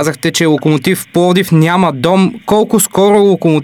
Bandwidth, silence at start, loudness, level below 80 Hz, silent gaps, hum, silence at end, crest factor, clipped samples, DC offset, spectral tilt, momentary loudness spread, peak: 19 kHz; 0 s; -11 LUFS; -48 dBFS; none; none; 0 s; 10 dB; under 0.1%; under 0.1%; -5.5 dB/octave; 4 LU; 0 dBFS